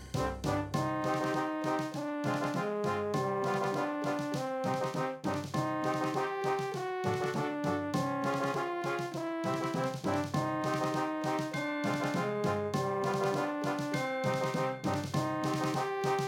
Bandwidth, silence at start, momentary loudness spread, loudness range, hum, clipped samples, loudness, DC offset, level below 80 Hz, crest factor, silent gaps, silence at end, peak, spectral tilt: 18 kHz; 0 s; 3 LU; 1 LU; none; under 0.1%; -33 LUFS; under 0.1%; -60 dBFS; 16 dB; none; 0 s; -16 dBFS; -6 dB/octave